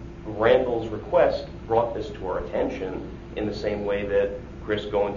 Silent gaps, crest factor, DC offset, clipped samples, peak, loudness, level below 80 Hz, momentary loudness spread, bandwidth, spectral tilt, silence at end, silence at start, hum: none; 20 dB; under 0.1%; under 0.1%; -6 dBFS; -25 LUFS; -42 dBFS; 11 LU; 7.4 kHz; -7 dB/octave; 0 s; 0 s; none